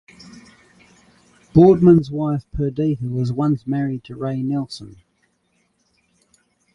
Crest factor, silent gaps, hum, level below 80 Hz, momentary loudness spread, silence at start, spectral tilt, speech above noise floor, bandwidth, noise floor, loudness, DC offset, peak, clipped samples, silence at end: 18 dB; none; none; -44 dBFS; 14 LU; 0.25 s; -9.5 dB/octave; 48 dB; 10.5 kHz; -66 dBFS; -18 LUFS; under 0.1%; -2 dBFS; under 0.1%; 1.85 s